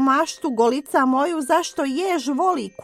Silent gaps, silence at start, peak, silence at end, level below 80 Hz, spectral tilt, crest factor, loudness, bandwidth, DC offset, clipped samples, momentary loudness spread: none; 0 s; -6 dBFS; 0 s; -66 dBFS; -3 dB/octave; 16 dB; -21 LUFS; 15 kHz; under 0.1%; under 0.1%; 4 LU